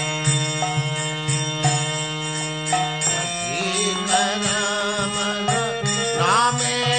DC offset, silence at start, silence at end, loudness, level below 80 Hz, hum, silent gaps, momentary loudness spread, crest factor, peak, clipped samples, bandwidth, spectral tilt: 0.1%; 0 s; 0 s; -21 LUFS; -54 dBFS; none; none; 5 LU; 16 dB; -6 dBFS; under 0.1%; 9.2 kHz; -3 dB/octave